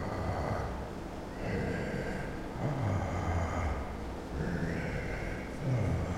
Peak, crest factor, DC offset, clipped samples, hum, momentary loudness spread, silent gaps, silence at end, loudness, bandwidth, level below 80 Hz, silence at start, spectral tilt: -20 dBFS; 14 dB; under 0.1%; under 0.1%; none; 7 LU; none; 0 s; -36 LUFS; 15.5 kHz; -44 dBFS; 0 s; -7 dB/octave